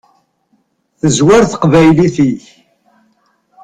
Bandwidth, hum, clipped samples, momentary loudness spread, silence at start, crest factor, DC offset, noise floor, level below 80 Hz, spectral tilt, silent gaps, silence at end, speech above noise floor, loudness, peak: 10.5 kHz; none; under 0.1%; 8 LU; 1.05 s; 12 dB; under 0.1%; -59 dBFS; -40 dBFS; -6 dB/octave; none; 1.25 s; 50 dB; -10 LUFS; 0 dBFS